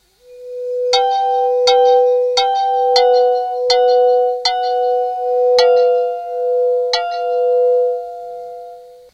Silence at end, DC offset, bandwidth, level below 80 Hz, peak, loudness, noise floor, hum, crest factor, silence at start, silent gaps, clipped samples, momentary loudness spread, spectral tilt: 0.2 s; under 0.1%; 8.8 kHz; -62 dBFS; 0 dBFS; -14 LUFS; -37 dBFS; none; 14 dB; 0.3 s; none; under 0.1%; 13 LU; 1 dB/octave